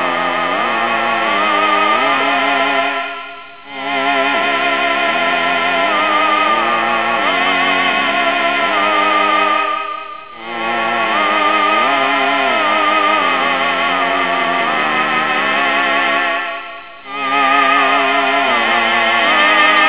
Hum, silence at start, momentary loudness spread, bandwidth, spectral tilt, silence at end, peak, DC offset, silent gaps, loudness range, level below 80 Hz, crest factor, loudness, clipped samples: none; 0 s; 9 LU; 4 kHz; -6 dB/octave; 0 s; 0 dBFS; 0.7%; none; 2 LU; -58 dBFS; 14 dB; -13 LUFS; under 0.1%